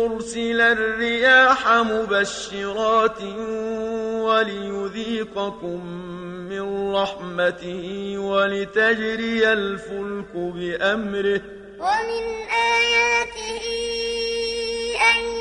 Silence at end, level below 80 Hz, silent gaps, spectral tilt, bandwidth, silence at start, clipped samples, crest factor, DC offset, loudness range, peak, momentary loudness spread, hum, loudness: 0 s; -50 dBFS; none; -3.5 dB/octave; 11 kHz; 0 s; under 0.1%; 18 dB; under 0.1%; 7 LU; -4 dBFS; 13 LU; none; -21 LUFS